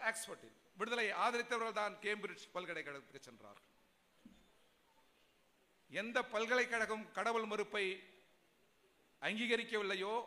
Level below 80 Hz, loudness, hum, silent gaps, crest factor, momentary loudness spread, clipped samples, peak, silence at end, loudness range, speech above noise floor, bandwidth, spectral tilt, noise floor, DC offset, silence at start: -84 dBFS; -40 LUFS; none; none; 20 dB; 14 LU; under 0.1%; -22 dBFS; 0 s; 13 LU; 34 dB; 15.5 kHz; -2.5 dB/octave; -75 dBFS; under 0.1%; 0 s